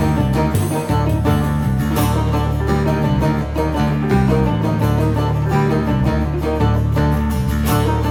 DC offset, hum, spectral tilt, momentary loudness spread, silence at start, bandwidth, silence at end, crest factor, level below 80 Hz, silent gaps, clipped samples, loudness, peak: under 0.1%; none; -7.5 dB/octave; 2 LU; 0 s; over 20 kHz; 0 s; 14 dB; -26 dBFS; none; under 0.1%; -17 LUFS; -2 dBFS